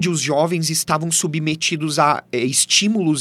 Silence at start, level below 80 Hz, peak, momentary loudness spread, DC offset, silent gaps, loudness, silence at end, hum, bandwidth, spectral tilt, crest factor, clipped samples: 0 s; -62 dBFS; 0 dBFS; 5 LU; under 0.1%; none; -17 LUFS; 0 s; none; 15.5 kHz; -3 dB/octave; 18 dB; under 0.1%